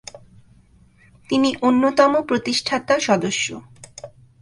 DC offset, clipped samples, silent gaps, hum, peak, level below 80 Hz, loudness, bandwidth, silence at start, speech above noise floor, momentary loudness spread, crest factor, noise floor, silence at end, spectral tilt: under 0.1%; under 0.1%; none; none; -2 dBFS; -56 dBFS; -19 LUFS; 11.5 kHz; 0.15 s; 34 dB; 23 LU; 20 dB; -53 dBFS; 0.35 s; -3.5 dB/octave